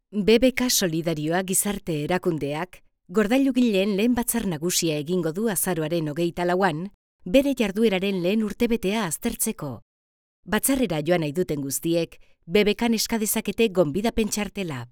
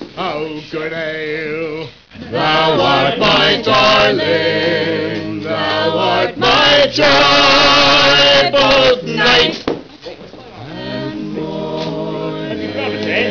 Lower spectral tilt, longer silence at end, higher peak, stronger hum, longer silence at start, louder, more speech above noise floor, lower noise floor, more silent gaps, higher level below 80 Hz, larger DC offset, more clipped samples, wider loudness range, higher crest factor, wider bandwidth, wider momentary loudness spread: about the same, -4 dB/octave vs -4 dB/octave; about the same, 0.05 s vs 0 s; about the same, -4 dBFS vs -6 dBFS; neither; about the same, 0.1 s vs 0 s; second, -23 LUFS vs -12 LUFS; first, over 67 dB vs 21 dB; first, under -90 dBFS vs -34 dBFS; first, 6.94-7.19 s, 9.82-10.43 s vs none; second, -48 dBFS vs -42 dBFS; neither; neither; second, 2 LU vs 9 LU; first, 20 dB vs 8 dB; first, over 20 kHz vs 5.4 kHz; second, 7 LU vs 16 LU